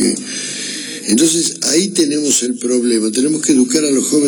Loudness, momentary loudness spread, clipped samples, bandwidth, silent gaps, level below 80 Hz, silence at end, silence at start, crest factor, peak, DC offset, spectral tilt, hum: -14 LUFS; 8 LU; under 0.1%; over 20 kHz; none; -62 dBFS; 0 s; 0 s; 12 dB; -2 dBFS; under 0.1%; -2.5 dB/octave; none